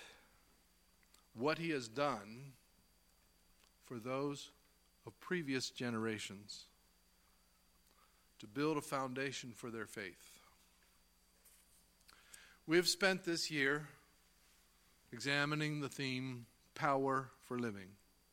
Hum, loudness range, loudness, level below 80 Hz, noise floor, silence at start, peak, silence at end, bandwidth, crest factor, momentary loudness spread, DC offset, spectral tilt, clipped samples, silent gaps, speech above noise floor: 60 Hz at -75 dBFS; 8 LU; -40 LUFS; -76 dBFS; -73 dBFS; 0 s; -16 dBFS; 0.4 s; 16.5 kHz; 28 dB; 23 LU; under 0.1%; -4 dB/octave; under 0.1%; none; 33 dB